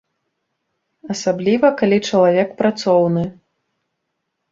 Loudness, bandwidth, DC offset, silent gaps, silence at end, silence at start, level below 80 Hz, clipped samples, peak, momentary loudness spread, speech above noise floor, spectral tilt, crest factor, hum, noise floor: -16 LUFS; 7.8 kHz; under 0.1%; none; 1.2 s; 1.05 s; -58 dBFS; under 0.1%; -2 dBFS; 8 LU; 59 dB; -6 dB/octave; 16 dB; none; -75 dBFS